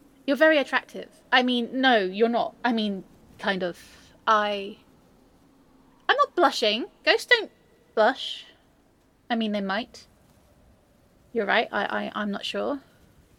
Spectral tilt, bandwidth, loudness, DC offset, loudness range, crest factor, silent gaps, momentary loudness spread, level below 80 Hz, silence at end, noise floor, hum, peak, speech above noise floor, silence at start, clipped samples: -4 dB/octave; 16.5 kHz; -24 LUFS; under 0.1%; 6 LU; 22 dB; none; 13 LU; -66 dBFS; 0.6 s; -62 dBFS; none; -4 dBFS; 37 dB; 0.25 s; under 0.1%